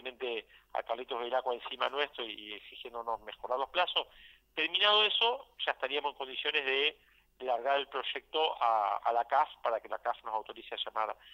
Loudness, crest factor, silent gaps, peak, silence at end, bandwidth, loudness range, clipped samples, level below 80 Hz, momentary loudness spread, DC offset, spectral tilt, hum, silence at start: -32 LUFS; 20 dB; none; -14 dBFS; 0 s; 16 kHz; 6 LU; under 0.1%; -72 dBFS; 13 LU; under 0.1%; -2.5 dB/octave; none; 0 s